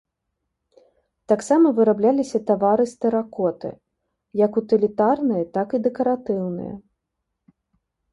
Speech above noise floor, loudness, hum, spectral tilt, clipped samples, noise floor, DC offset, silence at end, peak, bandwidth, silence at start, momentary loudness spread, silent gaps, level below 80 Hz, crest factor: 59 dB; -21 LUFS; none; -7.5 dB/octave; under 0.1%; -79 dBFS; under 0.1%; 1.35 s; -4 dBFS; 11.5 kHz; 1.3 s; 12 LU; none; -62 dBFS; 18 dB